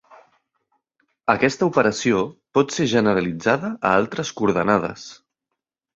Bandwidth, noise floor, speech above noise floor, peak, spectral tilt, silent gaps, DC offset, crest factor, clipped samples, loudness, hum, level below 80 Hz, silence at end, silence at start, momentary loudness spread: 8 kHz; -82 dBFS; 62 dB; -2 dBFS; -5 dB/octave; none; under 0.1%; 20 dB; under 0.1%; -20 LUFS; none; -56 dBFS; 0.8 s; 1.25 s; 8 LU